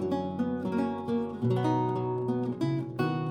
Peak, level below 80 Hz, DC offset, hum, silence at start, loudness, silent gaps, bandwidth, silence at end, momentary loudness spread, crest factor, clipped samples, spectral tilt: -16 dBFS; -66 dBFS; under 0.1%; none; 0 s; -30 LUFS; none; 9.6 kHz; 0 s; 4 LU; 14 dB; under 0.1%; -8.5 dB/octave